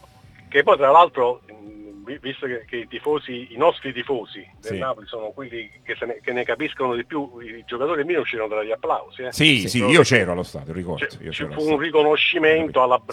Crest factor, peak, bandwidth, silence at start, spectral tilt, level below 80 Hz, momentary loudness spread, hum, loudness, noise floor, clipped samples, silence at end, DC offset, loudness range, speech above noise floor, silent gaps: 22 dB; 0 dBFS; 15 kHz; 0.5 s; -4.5 dB/octave; -56 dBFS; 18 LU; none; -20 LUFS; -48 dBFS; under 0.1%; 0 s; under 0.1%; 8 LU; 27 dB; none